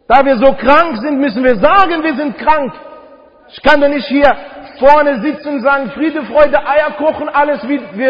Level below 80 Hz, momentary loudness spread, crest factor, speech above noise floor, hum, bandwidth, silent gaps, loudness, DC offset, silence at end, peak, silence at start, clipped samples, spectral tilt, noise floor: -40 dBFS; 9 LU; 12 dB; 29 dB; none; 7 kHz; none; -12 LUFS; 3%; 0 s; 0 dBFS; 0 s; 0.3%; -7 dB/octave; -40 dBFS